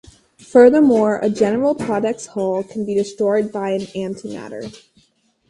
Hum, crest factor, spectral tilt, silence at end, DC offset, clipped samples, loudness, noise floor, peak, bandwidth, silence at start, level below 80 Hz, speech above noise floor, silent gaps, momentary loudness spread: none; 18 dB; -6.5 dB/octave; 0.75 s; under 0.1%; under 0.1%; -17 LUFS; -61 dBFS; 0 dBFS; 11.5 kHz; 0.55 s; -56 dBFS; 44 dB; none; 19 LU